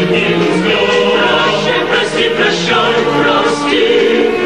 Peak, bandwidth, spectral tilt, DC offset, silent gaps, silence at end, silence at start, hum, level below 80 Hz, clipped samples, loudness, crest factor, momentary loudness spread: 0 dBFS; 11.5 kHz; -4.5 dB/octave; 0.8%; none; 0 s; 0 s; none; -48 dBFS; under 0.1%; -11 LUFS; 12 dB; 2 LU